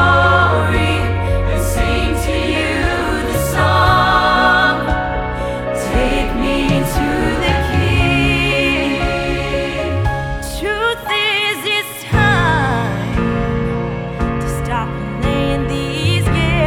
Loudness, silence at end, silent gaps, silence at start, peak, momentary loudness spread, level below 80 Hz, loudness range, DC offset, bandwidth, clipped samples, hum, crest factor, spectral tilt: -16 LUFS; 0 s; none; 0 s; 0 dBFS; 9 LU; -24 dBFS; 3 LU; under 0.1%; 17.5 kHz; under 0.1%; none; 14 dB; -5.5 dB/octave